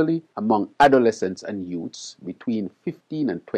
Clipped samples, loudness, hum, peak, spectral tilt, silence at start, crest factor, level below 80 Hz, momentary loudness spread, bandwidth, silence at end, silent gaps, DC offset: under 0.1%; -23 LUFS; none; -6 dBFS; -6 dB/octave; 0 s; 18 dB; -60 dBFS; 18 LU; 11 kHz; 0 s; none; under 0.1%